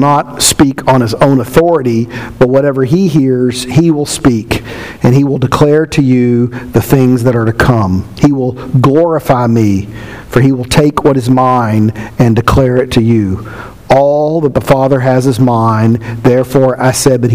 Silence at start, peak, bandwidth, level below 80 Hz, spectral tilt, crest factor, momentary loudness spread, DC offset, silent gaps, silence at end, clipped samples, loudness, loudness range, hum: 0 s; 0 dBFS; 16 kHz; -32 dBFS; -6 dB/octave; 10 dB; 6 LU; 1%; none; 0 s; 1%; -10 LUFS; 1 LU; none